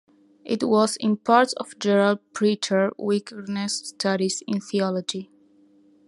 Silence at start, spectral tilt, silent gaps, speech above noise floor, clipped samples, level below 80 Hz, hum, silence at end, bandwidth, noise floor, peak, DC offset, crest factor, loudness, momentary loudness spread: 0.45 s; -4.5 dB/octave; none; 34 dB; under 0.1%; -74 dBFS; none; 0.85 s; 12 kHz; -57 dBFS; -4 dBFS; under 0.1%; 20 dB; -23 LUFS; 9 LU